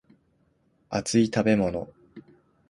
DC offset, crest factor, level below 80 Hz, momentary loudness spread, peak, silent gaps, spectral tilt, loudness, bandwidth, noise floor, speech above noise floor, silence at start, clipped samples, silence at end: under 0.1%; 20 dB; -56 dBFS; 13 LU; -8 dBFS; none; -5.5 dB/octave; -25 LUFS; 11.5 kHz; -67 dBFS; 44 dB; 0.9 s; under 0.1%; 0.5 s